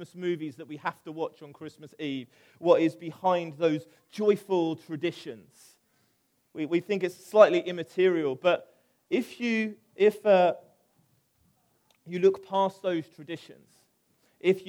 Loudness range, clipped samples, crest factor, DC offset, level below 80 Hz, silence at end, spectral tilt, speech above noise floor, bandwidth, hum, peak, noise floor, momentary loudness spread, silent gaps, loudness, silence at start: 6 LU; under 0.1%; 24 dB; under 0.1%; -82 dBFS; 0 s; -6.5 dB/octave; 44 dB; 16.5 kHz; none; -4 dBFS; -71 dBFS; 19 LU; none; -27 LUFS; 0 s